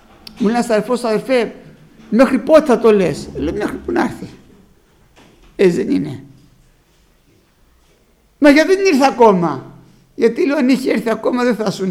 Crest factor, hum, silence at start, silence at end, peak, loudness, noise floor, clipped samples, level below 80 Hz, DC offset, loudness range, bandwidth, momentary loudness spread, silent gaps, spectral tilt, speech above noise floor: 16 dB; none; 0.35 s; 0 s; 0 dBFS; -15 LUFS; -54 dBFS; under 0.1%; -46 dBFS; under 0.1%; 8 LU; 15.5 kHz; 12 LU; none; -6 dB/octave; 40 dB